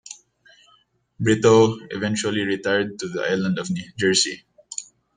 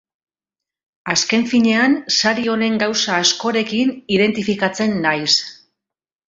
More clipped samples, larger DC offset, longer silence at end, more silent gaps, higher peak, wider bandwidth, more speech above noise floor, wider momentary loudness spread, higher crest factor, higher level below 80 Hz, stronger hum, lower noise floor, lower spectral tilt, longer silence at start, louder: neither; neither; second, 0.35 s vs 0.75 s; neither; about the same, -2 dBFS vs -2 dBFS; first, 10 kHz vs 7.8 kHz; second, 40 dB vs 70 dB; first, 18 LU vs 5 LU; about the same, 20 dB vs 16 dB; about the same, -60 dBFS vs -60 dBFS; neither; second, -61 dBFS vs -87 dBFS; about the same, -4 dB/octave vs -3 dB/octave; second, 0.1 s vs 1.05 s; second, -21 LUFS vs -17 LUFS